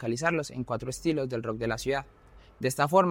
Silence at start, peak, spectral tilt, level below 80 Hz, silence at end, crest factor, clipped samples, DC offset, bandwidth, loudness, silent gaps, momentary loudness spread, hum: 0 s; -10 dBFS; -5.5 dB/octave; -54 dBFS; 0 s; 20 dB; under 0.1%; under 0.1%; 17 kHz; -30 LUFS; none; 9 LU; none